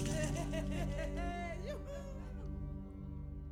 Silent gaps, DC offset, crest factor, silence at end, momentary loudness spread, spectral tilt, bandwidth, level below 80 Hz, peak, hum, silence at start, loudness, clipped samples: none; under 0.1%; 16 dB; 0 s; 9 LU; -6 dB/octave; 16.5 kHz; -44 dBFS; -24 dBFS; none; 0 s; -42 LUFS; under 0.1%